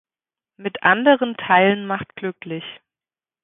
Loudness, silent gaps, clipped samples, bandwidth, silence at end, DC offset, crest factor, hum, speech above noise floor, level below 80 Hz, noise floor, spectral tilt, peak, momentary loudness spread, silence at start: -18 LUFS; none; under 0.1%; 3.9 kHz; 0.7 s; under 0.1%; 20 dB; none; over 71 dB; -64 dBFS; under -90 dBFS; -10 dB/octave; -2 dBFS; 16 LU; 0.6 s